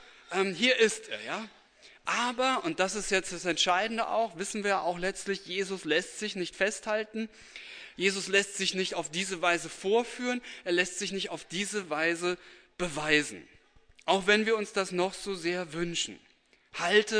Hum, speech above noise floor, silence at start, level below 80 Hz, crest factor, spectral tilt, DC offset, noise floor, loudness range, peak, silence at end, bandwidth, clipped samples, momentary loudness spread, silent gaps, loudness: none; 30 dB; 0 s; -62 dBFS; 22 dB; -2.5 dB/octave; under 0.1%; -60 dBFS; 2 LU; -10 dBFS; 0 s; 11 kHz; under 0.1%; 12 LU; none; -30 LUFS